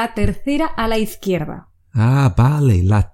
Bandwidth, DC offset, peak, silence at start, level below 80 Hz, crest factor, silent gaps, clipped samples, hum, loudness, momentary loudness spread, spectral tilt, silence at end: 17 kHz; under 0.1%; -2 dBFS; 0 s; -30 dBFS; 14 dB; none; under 0.1%; none; -17 LUFS; 10 LU; -7.5 dB/octave; 0.05 s